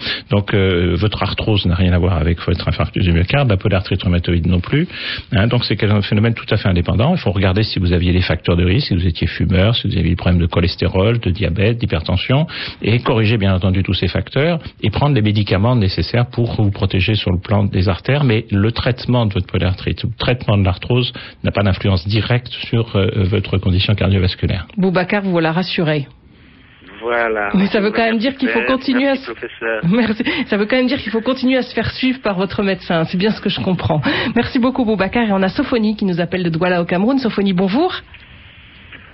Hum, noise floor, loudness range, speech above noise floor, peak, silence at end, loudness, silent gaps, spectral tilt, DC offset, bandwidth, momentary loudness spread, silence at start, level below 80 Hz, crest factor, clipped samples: none; -44 dBFS; 2 LU; 29 dB; -4 dBFS; 0.1 s; -16 LUFS; none; -10 dB/octave; under 0.1%; 5.8 kHz; 4 LU; 0 s; -28 dBFS; 12 dB; under 0.1%